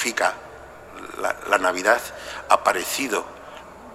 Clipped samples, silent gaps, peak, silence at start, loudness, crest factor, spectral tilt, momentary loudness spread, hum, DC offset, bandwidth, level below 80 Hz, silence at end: under 0.1%; none; 0 dBFS; 0 s; -22 LUFS; 24 dB; -1.5 dB/octave; 21 LU; none; under 0.1%; 16 kHz; -56 dBFS; 0 s